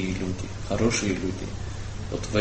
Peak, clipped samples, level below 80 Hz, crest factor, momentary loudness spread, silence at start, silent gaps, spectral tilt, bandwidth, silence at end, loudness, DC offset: -6 dBFS; under 0.1%; -38 dBFS; 20 dB; 11 LU; 0 s; none; -5 dB/octave; 8.8 kHz; 0 s; -29 LUFS; under 0.1%